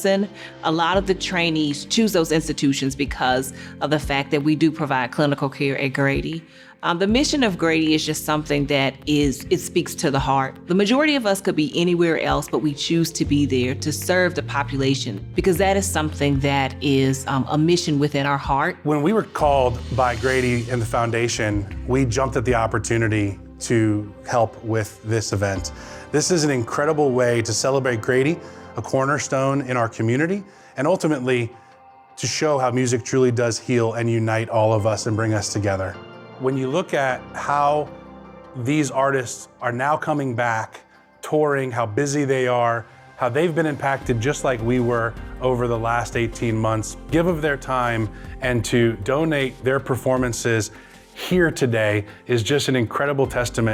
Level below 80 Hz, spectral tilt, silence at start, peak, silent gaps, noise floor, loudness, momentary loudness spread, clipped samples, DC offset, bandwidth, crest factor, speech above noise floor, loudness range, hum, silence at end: -40 dBFS; -5 dB/octave; 0 s; -6 dBFS; none; -48 dBFS; -21 LUFS; 6 LU; under 0.1%; under 0.1%; 16.5 kHz; 16 dB; 27 dB; 3 LU; none; 0 s